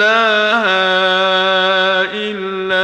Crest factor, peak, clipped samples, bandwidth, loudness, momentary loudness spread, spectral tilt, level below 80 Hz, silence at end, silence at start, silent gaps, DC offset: 14 dB; 0 dBFS; under 0.1%; 9.8 kHz; -13 LUFS; 8 LU; -3.5 dB/octave; -58 dBFS; 0 s; 0 s; none; under 0.1%